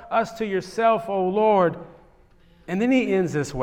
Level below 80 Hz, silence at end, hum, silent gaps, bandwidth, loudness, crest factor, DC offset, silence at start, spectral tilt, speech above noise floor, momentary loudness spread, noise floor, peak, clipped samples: -56 dBFS; 0 s; none; none; 14.5 kHz; -22 LUFS; 14 dB; under 0.1%; 0 s; -6.5 dB/octave; 32 dB; 8 LU; -54 dBFS; -8 dBFS; under 0.1%